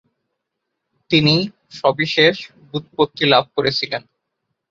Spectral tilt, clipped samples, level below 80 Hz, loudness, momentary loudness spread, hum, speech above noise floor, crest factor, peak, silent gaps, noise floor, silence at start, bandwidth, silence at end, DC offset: -5.5 dB/octave; under 0.1%; -56 dBFS; -17 LUFS; 14 LU; none; 60 dB; 18 dB; -2 dBFS; none; -78 dBFS; 1.1 s; 7.4 kHz; 0.7 s; under 0.1%